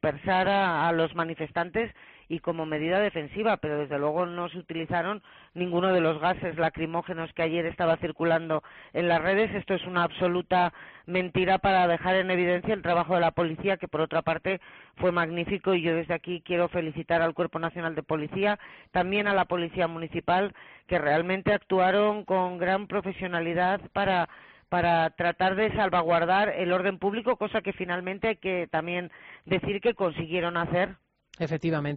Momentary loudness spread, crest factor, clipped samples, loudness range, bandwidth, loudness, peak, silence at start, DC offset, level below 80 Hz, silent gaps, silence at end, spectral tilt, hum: 8 LU; 14 dB; under 0.1%; 4 LU; 5 kHz; -27 LUFS; -12 dBFS; 0.05 s; under 0.1%; -56 dBFS; none; 0 s; -4 dB/octave; none